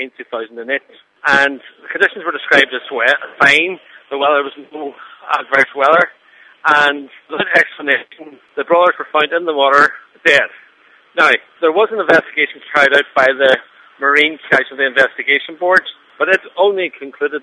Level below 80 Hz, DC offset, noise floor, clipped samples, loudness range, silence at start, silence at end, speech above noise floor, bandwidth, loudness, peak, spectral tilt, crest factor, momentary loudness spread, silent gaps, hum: -64 dBFS; under 0.1%; -49 dBFS; 0.1%; 2 LU; 0 s; 0.05 s; 35 dB; 11.5 kHz; -13 LUFS; 0 dBFS; -3 dB/octave; 16 dB; 14 LU; none; none